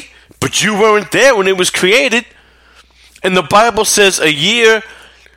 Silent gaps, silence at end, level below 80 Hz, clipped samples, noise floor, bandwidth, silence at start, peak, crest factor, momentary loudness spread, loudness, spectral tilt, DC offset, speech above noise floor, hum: none; 0.45 s; -46 dBFS; under 0.1%; -45 dBFS; 16.5 kHz; 0 s; 0 dBFS; 12 dB; 7 LU; -10 LUFS; -2.5 dB/octave; under 0.1%; 35 dB; none